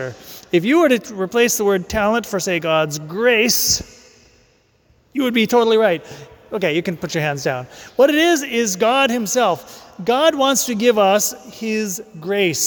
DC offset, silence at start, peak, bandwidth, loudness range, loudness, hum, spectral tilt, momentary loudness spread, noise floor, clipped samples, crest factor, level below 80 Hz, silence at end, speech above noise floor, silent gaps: under 0.1%; 0 s; -4 dBFS; 19.5 kHz; 3 LU; -17 LUFS; none; -3 dB/octave; 12 LU; -57 dBFS; under 0.1%; 14 dB; -48 dBFS; 0 s; 39 dB; none